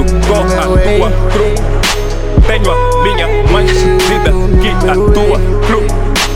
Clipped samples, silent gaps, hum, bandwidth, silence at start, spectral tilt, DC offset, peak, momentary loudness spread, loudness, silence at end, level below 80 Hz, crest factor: under 0.1%; none; none; 15.5 kHz; 0 s; -5.5 dB/octave; 3%; 0 dBFS; 3 LU; -11 LUFS; 0 s; -12 dBFS; 8 dB